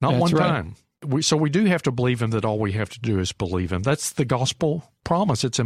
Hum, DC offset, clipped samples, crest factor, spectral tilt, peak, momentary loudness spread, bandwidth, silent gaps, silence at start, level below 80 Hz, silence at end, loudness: none; under 0.1%; under 0.1%; 16 dB; -5.5 dB/octave; -6 dBFS; 7 LU; 15 kHz; none; 0 s; -48 dBFS; 0 s; -23 LUFS